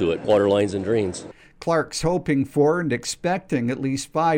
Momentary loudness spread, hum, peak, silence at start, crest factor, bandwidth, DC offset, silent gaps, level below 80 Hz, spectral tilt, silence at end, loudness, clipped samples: 6 LU; none; -8 dBFS; 0 s; 14 dB; 16.5 kHz; under 0.1%; none; -50 dBFS; -5.5 dB/octave; 0 s; -22 LUFS; under 0.1%